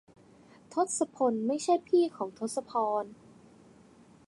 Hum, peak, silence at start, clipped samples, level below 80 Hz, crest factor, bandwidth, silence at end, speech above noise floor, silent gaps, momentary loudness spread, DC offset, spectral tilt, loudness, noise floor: none; -14 dBFS; 0.7 s; under 0.1%; -76 dBFS; 18 dB; 11.5 kHz; 1.15 s; 28 dB; none; 10 LU; under 0.1%; -4.5 dB/octave; -30 LUFS; -58 dBFS